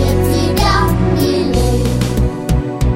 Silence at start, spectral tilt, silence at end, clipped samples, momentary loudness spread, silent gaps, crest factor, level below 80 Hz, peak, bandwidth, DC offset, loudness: 0 s; -6 dB/octave; 0 s; under 0.1%; 4 LU; none; 12 dB; -20 dBFS; 0 dBFS; 16.5 kHz; under 0.1%; -14 LUFS